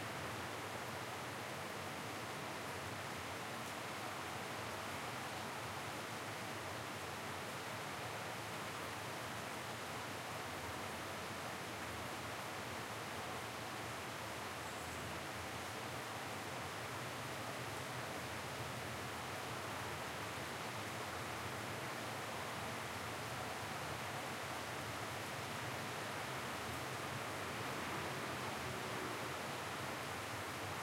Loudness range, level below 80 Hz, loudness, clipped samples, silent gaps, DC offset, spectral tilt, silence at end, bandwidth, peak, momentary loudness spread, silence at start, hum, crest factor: 2 LU; -70 dBFS; -44 LUFS; under 0.1%; none; under 0.1%; -3.5 dB/octave; 0 s; 16 kHz; -30 dBFS; 2 LU; 0 s; none; 14 dB